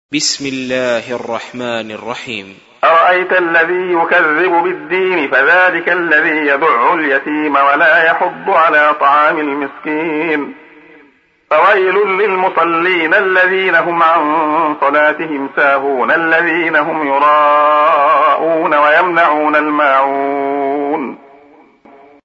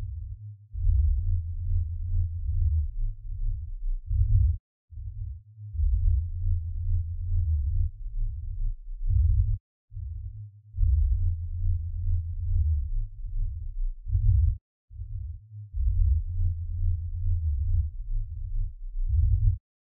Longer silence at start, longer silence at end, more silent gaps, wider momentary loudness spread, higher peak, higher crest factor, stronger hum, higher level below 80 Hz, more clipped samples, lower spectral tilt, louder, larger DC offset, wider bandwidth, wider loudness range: about the same, 0.1 s vs 0 s; first, 1.1 s vs 0.4 s; second, none vs 4.60-4.88 s, 9.60-9.88 s, 14.61-14.88 s; second, 10 LU vs 14 LU; first, 0 dBFS vs -10 dBFS; about the same, 12 dB vs 16 dB; neither; second, -64 dBFS vs -28 dBFS; neither; second, -3.5 dB/octave vs -13.5 dB/octave; first, -12 LUFS vs -30 LUFS; neither; first, 8 kHz vs 0.2 kHz; about the same, 4 LU vs 2 LU